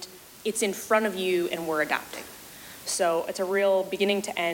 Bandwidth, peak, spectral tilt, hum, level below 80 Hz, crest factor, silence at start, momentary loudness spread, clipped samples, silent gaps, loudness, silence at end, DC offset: 17 kHz; -10 dBFS; -3 dB/octave; none; -66 dBFS; 18 dB; 0 s; 15 LU; under 0.1%; none; -26 LUFS; 0 s; under 0.1%